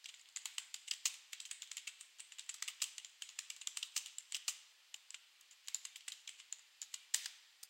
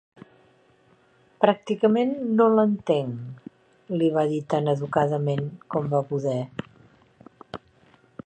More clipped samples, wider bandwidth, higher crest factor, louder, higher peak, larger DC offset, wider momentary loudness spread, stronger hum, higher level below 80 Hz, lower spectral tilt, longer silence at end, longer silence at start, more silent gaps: neither; first, 17 kHz vs 8.8 kHz; first, 32 dB vs 24 dB; second, -45 LUFS vs -24 LUFS; second, -18 dBFS vs -2 dBFS; neither; second, 14 LU vs 19 LU; neither; second, under -90 dBFS vs -66 dBFS; second, 8.5 dB/octave vs -8 dB/octave; second, 0 s vs 0.7 s; second, 0 s vs 1.4 s; neither